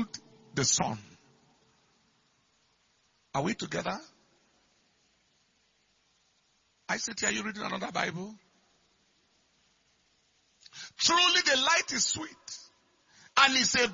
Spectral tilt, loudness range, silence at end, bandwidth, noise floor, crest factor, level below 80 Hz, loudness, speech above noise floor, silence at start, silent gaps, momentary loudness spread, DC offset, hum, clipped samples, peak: -1.5 dB/octave; 13 LU; 0 s; 7.6 kHz; -71 dBFS; 26 dB; -68 dBFS; -27 LUFS; 42 dB; 0 s; none; 23 LU; under 0.1%; none; under 0.1%; -6 dBFS